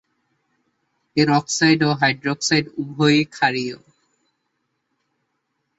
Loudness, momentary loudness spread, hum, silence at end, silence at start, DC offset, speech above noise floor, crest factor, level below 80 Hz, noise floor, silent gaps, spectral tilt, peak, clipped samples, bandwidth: -19 LUFS; 10 LU; none; 2.05 s; 1.15 s; under 0.1%; 55 dB; 20 dB; -60 dBFS; -74 dBFS; none; -4.5 dB/octave; -4 dBFS; under 0.1%; 8 kHz